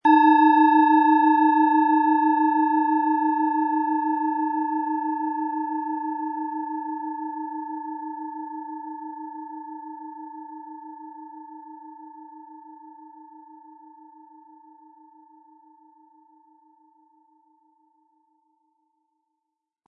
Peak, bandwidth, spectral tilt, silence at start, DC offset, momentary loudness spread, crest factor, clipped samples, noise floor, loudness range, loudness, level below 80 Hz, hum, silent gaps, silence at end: -6 dBFS; 5 kHz; -6 dB/octave; 0.05 s; under 0.1%; 25 LU; 18 dB; under 0.1%; -83 dBFS; 25 LU; -22 LUFS; under -90 dBFS; none; none; 6.45 s